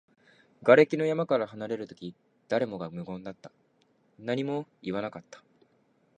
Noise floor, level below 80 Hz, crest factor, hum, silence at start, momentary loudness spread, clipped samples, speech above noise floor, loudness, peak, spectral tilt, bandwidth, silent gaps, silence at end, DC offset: -68 dBFS; -72 dBFS; 26 dB; none; 0.6 s; 23 LU; under 0.1%; 40 dB; -28 LUFS; -4 dBFS; -7 dB/octave; 9 kHz; none; 0.8 s; under 0.1%